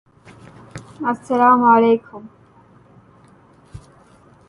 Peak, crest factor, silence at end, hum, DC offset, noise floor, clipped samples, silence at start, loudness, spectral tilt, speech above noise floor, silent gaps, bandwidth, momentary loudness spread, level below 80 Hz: -2 dBFS; 18 dB; 0.7 s; none; under 0.1%; -50 dBFS; under 0.1%; 0.75 s; -15 LUFS; -7 dB/octave; 34 dB; none; 11 kHz; 27 LU; -56 dBFS